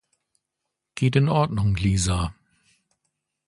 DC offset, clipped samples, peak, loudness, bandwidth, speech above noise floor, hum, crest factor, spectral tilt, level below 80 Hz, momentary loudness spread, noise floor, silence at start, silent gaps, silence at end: under 0.1%; under 0.1%; -8 dBFS; -23 LUFS; 11.5 kHz; 61 dB; none; 18 dB; -6 dB/octave; -38 dBFS; 9 LU; -83 dBFS; 0.95 s; none; 1.15 s